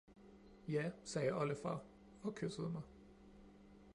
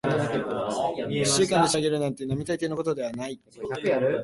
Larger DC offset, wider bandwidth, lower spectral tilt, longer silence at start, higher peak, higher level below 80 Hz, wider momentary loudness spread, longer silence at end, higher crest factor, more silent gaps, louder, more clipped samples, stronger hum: neither; about the same, 11.5 kHz vs 11.5 kHz; first, -6 dB/octave vs -4.5 dB/octave; about the same, 0.1 s vs 0.05 s; second, -28 dBFS vs -8 dBFS; second, -70 dBFS vs -58 dBFS; first, 23 LU vs 11 LU; about the same, 0 s vs 0 s; about the same, 18 dB vs 18 dB; neither; second, -43 LUFS vs -26 LUFS; neither; neither